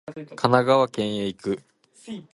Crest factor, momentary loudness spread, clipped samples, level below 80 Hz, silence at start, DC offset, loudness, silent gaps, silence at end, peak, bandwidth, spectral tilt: 22 dB; 20 LU; under 0.1%; -62 dBFS; 0.1 s; under 0.1%; -23 LUFS; none; 0.1 s; -2 dBFS; 11.5 kHz; -6 dB/octave